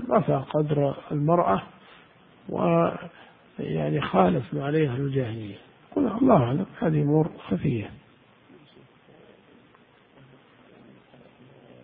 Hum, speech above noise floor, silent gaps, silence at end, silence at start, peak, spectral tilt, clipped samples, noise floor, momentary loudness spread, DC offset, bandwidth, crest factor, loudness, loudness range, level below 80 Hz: none; 33 dB; none; 3.85 s; 0 s; -4 dBFS; -12 dB/octave; under 0.1%; -57 dBFS; 17 LU; under 0.1%; 3.9 kHz; 22 dB; -25 LUFS; 6 LU; -56 dBFS